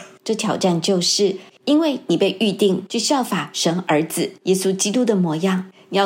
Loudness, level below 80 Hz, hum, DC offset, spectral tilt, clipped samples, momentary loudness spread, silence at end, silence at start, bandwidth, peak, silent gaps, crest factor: -19 LUFS; -74 dBFS; none; under 0.1%; -4 dB/octave; under 0.1%; 6 LU; 0 s; 0 s; 16.5 kHz; -4 dBFS; none; 16 dB